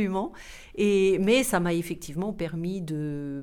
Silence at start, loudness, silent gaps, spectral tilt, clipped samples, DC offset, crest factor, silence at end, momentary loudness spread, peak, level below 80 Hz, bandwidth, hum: 0 s; -26 LUFS; none; -5.5 dB/octave; under 0.1%; under 0.1%; 18 dB; 0 s; 12 LU; -8 dBFS; -50 dBFS; 19 kHz; none